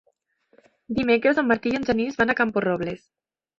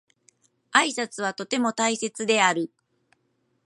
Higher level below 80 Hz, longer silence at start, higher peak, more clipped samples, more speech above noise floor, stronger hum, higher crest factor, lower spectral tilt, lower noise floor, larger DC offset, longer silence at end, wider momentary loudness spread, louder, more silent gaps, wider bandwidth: first, -54 dBFS vs -80 dBFS; first, 0.9 s vs 0.75 s; second, -6 dBFS vs -2 dBFS; neither; about the same, 44 dB vs 47 dB; neither; second, 18 dB vs 24 dB; first, -6.5 dB/octave vs -2 dB/octave; second, -66 dBFS vs -71 dBFS; neither; second, 0.6 s vs 1 s; about the same, 10 LU vs 9 LU; about the same, -23 LUFS vs -24 LUFS; neither; second, 7.4 kHz vs 11.5 kHz